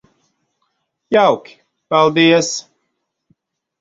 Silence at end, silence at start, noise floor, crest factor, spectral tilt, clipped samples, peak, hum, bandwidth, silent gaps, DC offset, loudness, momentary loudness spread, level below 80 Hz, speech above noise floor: 1.2 s; 1.1 s; -72 dBFS; 18 dB; -4 dB/octave; under 0.1%; 0 dBFS; none; 7.8 kHz; none; under 0.1%; -14 LUFS; 11 LU; -62 dBFS; 59 dB